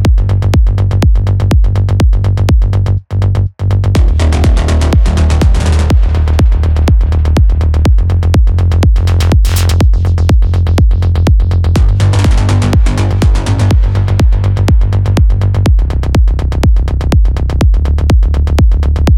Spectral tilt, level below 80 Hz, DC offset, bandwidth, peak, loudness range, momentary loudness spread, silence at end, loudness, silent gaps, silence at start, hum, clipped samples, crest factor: -7 dB/octave; -10 dBFS; under 0.1%; 13.5 kHz; 0 dBFS; 1 LU; 2 LU; 0 s; -11 LUFS; none; 0 s; none; under 0.1%; 8 dB